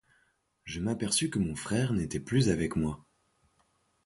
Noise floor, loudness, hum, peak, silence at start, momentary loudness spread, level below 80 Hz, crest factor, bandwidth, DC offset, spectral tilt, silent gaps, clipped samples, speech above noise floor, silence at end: -72 dBFS; -30 LUFS; none; -12 dBFS; 0.65 s; 10 LU; -50 dBFS; 20 dB; 11.5 kHz; under 0.1%; -5 dB/octave; none; under 0.1%; 42 dB; 1.1 s